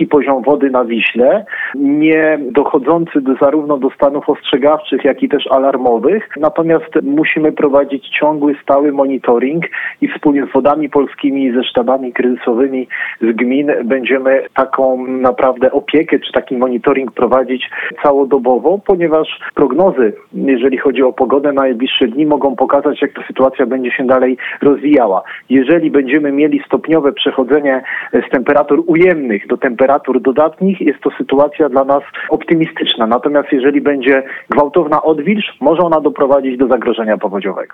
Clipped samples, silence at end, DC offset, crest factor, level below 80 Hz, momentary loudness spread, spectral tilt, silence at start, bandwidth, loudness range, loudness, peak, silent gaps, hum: under 0.1%; 0.1 s; under 0.1%; 12 dB; -50 dBFS; 5 LU; -8 dB/octave; 0 s; 3.9 kHz; 2 LU; -13 LUFS; 0 dBFS; none; none